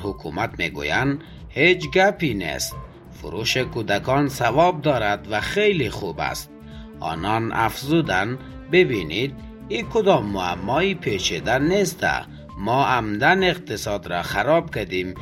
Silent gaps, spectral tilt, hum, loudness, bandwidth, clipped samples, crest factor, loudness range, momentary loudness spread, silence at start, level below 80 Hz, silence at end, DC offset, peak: none; -5 dB/octave; none; -21 LUFS; 16.5 kHz; under 0.1%; 20 dB; 2 LU; 12 LU; 0 s; -44 dBFS; 0 s; under 0.1%; -2 dBFS